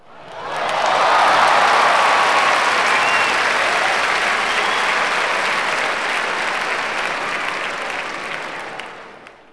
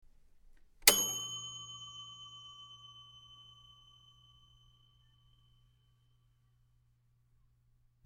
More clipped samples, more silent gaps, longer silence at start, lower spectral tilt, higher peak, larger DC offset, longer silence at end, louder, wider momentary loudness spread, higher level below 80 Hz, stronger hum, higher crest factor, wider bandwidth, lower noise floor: neither; neither; second, 0.05 s vs 0.85 s; first, -1 dB/octave vs 0.5 dB/octave; about the same, -2 dBFS vs -4 dBFS; neither; second, 0.2 s vs 4.65 s; first, -16 LUFS vs -30 LUFS; second, 13 LU vs 29 LU; first, -56 dBFS vs -66 dBFS; neither; second, 16 dB vs 38 dB; second, 11 kHz vs 17 kHz; second, -40 dBFS vs -72 dBFS